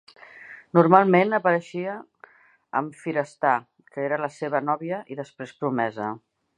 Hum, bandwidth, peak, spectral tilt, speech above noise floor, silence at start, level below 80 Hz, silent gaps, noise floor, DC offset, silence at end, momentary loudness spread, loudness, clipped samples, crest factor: none; 10 kHz; -2 dBFS; -7.5 dB/octave; 30 dB; 0.35 s; -74 dBFS; none; -53 dBFS; under 0.1%; 0.4 s; 21 LU; -24 LUFS; under 0.1%; 24 dB